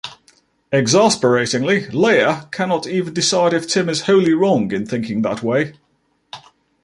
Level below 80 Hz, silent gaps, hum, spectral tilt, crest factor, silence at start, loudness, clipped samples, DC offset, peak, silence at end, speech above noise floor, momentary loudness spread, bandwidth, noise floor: -58 dBFS; none; none; -4.5 dB/octave; 16 dB; 0.05 s; -17 LUFS; under 0.1%; under 0.1%; -2 dBFS; 0.45 s; 47 dB; 10 LU; 11.5 kHz; -63 dBFS